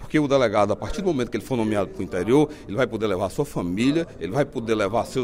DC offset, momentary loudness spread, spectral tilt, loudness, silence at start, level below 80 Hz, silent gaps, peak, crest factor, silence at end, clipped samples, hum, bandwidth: under 0.1%; 7 LU; -6.5 dB/octave; -23 LUFS; 0 s; -44 dBFS; none; -6 dBFS; 16 dB; 0 s; under 0.1%; none; 16 kHz